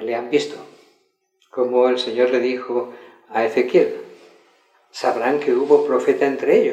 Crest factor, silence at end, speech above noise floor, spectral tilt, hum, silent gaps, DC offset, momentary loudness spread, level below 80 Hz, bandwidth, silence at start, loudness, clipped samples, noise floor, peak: 18 dB; 0 s; 47 dB; -5 dB/octave; none; none; under 0.1%; 14 LU; -82 dBFS; 9.4 kHz; 0 s; -19 LUFS; under 0.1%; -65 dBFS; -2 dBFS